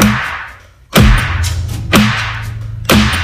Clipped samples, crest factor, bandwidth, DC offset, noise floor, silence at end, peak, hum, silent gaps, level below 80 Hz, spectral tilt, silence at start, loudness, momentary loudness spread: 0.3%; 12 dB; 18.5 kHz; under 0.1%; -35 dBFS; 0 s; 0 dBFS; none; none; -20 dBFS; -4.5 dB/octave; 0 s; -13 LUFS; 13 LU